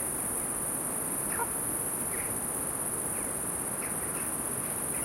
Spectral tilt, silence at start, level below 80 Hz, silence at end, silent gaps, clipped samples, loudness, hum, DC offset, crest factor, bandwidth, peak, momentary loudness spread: -2.5 dB/octave; 0 s; -56 dBFS; 0 s; none; under 0.1%; -30 LUFS; none; under 0.1%; 14 dB; 16.5 kHz; -18 dBFS; 1 LU